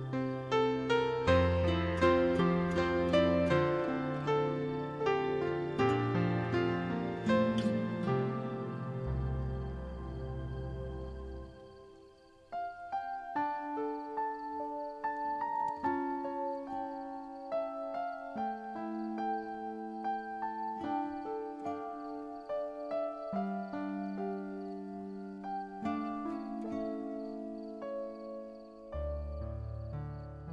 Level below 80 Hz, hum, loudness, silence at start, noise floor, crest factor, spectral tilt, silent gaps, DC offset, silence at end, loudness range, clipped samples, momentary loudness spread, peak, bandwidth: -50 dBFS; none; -35 LUFS; 0 s; -59 dBFS; 18 dB; -7.5 dB/octave; none; under 0.1%; 0 s; 11 LU; under 0.1%; 13 LU; -16 dBFS; 10 kHz